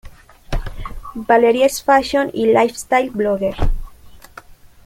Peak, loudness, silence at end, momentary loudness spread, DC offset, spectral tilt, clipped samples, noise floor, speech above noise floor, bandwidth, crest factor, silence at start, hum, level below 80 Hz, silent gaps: -2 dBFS; -16 LUFS; 0.3 s; 17 LU; under 0.1%; -5 dB/octave; under 0.1%; -41 dBFS; 26 dB; 16.5 kHz; 16 dB; 0.05 s; none; -28 dBFS; none